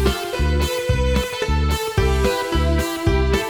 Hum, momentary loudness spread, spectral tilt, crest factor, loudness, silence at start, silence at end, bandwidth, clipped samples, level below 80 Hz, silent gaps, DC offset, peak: none; 2 LU; -5.5 dB/octave; 16 dB; -20 LUFS; 0 s; 0 s; 19.5 kHz; under 0.1%; -24 dBFS; none; under 0.1%; -4 dBFS